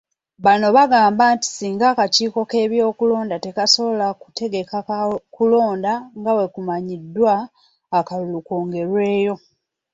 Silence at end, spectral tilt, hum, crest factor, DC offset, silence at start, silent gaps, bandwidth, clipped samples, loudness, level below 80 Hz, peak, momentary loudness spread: 0.55 s; -4 dB/octave; none; 16 dB; under 0.1%; 0.4 s; none; 8 kHz; under 0.1%; -18 LUFS; -64 dBFS; -2 dBFS; 11 LU